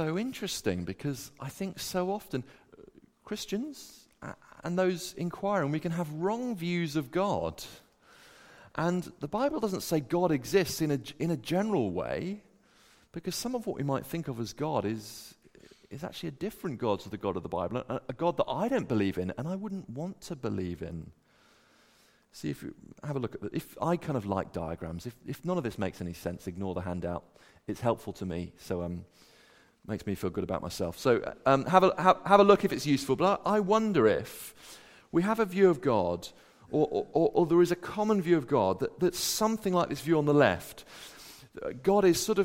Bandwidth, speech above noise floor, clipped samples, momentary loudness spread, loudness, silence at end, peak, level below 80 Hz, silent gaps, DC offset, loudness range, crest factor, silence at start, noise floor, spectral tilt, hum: 16.5 kHz; 34 dB; under 0.1%; 17 LU; -30 LUFS; 0 s; -6 dBFS; -60 dBFS; none; under 0.1%; 11 LU; 26 dB; 0 s; -64 dBFS; -5.5 dB/octave; none